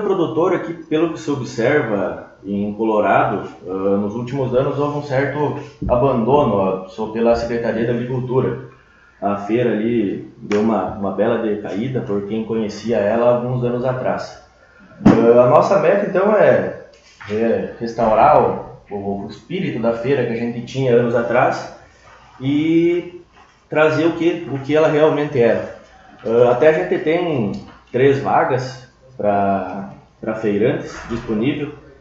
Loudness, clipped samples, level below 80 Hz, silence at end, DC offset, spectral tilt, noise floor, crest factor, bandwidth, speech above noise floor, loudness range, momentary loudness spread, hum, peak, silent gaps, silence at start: -18 LUFS; under 0.1%; -46 dBFS; 0.2 s; under 0.1%; -7.5 dB/octave; -49 dBFS; 18 dB; 7.6 kHz; 32 dB; 5 LU; 13 LU; none; 0 dBFS; none; 0 s